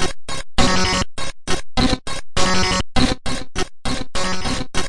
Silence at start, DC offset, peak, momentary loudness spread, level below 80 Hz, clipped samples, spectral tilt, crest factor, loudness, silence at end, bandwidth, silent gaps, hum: 0 s; under 0.1%; -2 dBFS; 9 LU; -28 dBFS; under 0.1%; -3.5 dB/octave; 16 dB; -21 LUFS; 0 s; 11.5 kHz; none; none